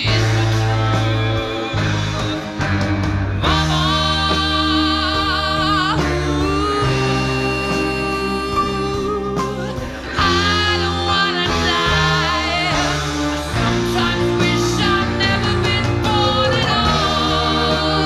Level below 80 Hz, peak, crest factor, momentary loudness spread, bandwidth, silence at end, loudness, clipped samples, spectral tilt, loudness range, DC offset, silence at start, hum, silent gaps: -30 dBFS; -2 dBFS; 16 dB; 5 LU; 13.5 kHz; 0 s; -17 LUFS; under 0.1%; -5 dB/octave; 3 LU; under 0.1%; 0 s; none; none